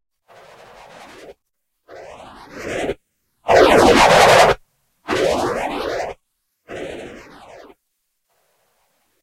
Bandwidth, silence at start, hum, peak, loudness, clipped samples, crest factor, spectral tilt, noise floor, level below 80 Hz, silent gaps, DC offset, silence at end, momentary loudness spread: 16 kHz; 1.3 s; none; 0 dBFS; -15 LUFS; under 0.1%; 20 dB; -3.5 dB/octave; -75 dBFS; -42 dBFS; none; under 0.1%; 2.05 s; 26 LU